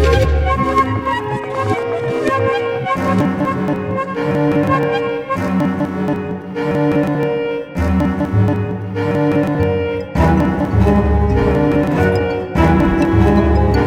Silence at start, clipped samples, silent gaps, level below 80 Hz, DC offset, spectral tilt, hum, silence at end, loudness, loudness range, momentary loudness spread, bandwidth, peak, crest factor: 0 s; under 0.1%; none; -24 dBFS; under 0.1%; -8 dB/octave; none; 0 s; -16 LUFS; 4 LU; 7 LU; 13.5 kHz; 0 dBFS; 14 dB